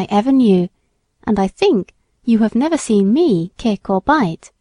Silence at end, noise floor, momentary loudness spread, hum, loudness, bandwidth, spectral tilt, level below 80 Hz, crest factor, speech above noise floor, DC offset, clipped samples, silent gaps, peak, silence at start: 0.15 s; -57 dBFS; 9 LU; none; -16 LUFS; 11 kHz; -6.5 dB/octave; -46 dBFS; 16 dB; 42 dB; under 0.1%; under 0.1%; none; 0 dBFS; 0 s